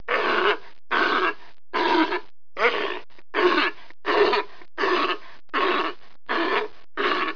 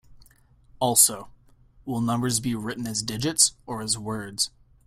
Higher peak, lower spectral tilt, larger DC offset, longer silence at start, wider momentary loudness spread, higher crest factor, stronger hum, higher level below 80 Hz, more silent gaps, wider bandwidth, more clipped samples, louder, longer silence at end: about the same, -6 dBFS vs -4 dBFS; about the same, -3.5 dB/octave vs -2.5 dB/octave; first, 2% vs under 0.1%; about the same, 0.1 s vs 0.1 s; second, 11 LU vs 15 LU; second, 18 dB vs 24 dB; neither; second, -66 dBFS vs -56 dBFS; neither; second, 5.4 kHz vs 16 kHz; neither; about the same, -24 LUFS vs -23 LUFS; second, 0 s vs 0.4 s